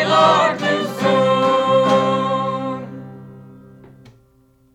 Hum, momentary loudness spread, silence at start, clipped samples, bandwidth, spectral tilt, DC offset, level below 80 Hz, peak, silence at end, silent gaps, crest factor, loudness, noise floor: none; 16 LU; 0 s; under 0.1%; 13.5 kHz; -5.5 dB/octave; under 0.1%; -60 dBFS; -2 dBFS; 1.3 s; none; 16 dB; -16 LUFS; -55 dBFS